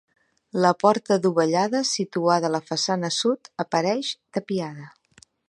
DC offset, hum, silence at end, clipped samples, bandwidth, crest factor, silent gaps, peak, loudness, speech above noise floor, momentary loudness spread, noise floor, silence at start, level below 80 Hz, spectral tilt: under 0.1%; none; 0.6 s; under 0.1%; 11.5 kHz; 20 dB; none; -4 dBFS; -23 LUFS; 34 dB; 9 LU; -57 dBFS; 0.55 s; -72 dBFS; -4.5 dB/octave